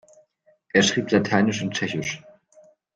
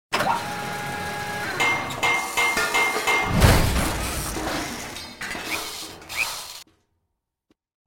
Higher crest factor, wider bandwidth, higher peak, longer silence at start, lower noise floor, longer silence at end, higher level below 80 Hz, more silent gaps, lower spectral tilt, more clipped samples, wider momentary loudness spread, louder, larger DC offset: about the same, 20 dB vs 20 dB; second, 9.4 kHz vs 19.5 kHz; about the same, -4 dBFS vs -4 dBFS; first, 0.75 s vs 0.1 s; second, -62 dBFS vs -78 dBFS; second, 0.75 s vs 1.25 s; second, -60 dBFS vs -34 dBFS; neither; about the same, -4 dB/octave vs -3.5 dB/octave; neither; second, 10 LU vs 14 LU; about the same, -22 LUFS vs -23 LUFS; neither